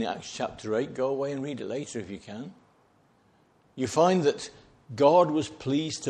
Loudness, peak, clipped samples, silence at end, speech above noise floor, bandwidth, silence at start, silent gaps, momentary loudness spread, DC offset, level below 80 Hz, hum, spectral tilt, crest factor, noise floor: -27 LUFS; -8 dBFS; under 0.1%; 0 s; 37 dB; 11.5 kHz; 0 s; none; 20 LU; under 0.1%; -66 dBFS; none; -5.5 dB/octave; 22 dB; -64 dBFS